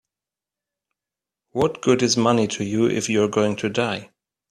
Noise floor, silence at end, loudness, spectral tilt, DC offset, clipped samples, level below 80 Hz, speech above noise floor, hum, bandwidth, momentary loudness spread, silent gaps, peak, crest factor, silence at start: -89 dBFS; 0.45 s; -21 LUFS; -4.5 dB/octave; under 0.1%; under 0.1%; -58 dBFS; 69 dB; none; 12.5 kHz; 7 LU; none; -4 dBFS; 18 dB; 1.55 s